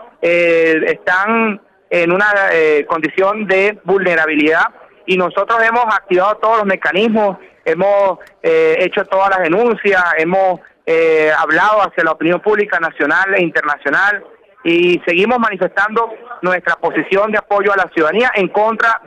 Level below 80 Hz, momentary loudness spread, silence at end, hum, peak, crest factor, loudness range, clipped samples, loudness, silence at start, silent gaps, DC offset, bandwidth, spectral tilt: -56 dBFS; 6 LU; 0.1 s; none; -2 dBFS; 10 dB; 2 LU; under 0.1%; -13 LUFS; 0 s; none; under 0.1%; 9.4 kHz; -6 dB/octave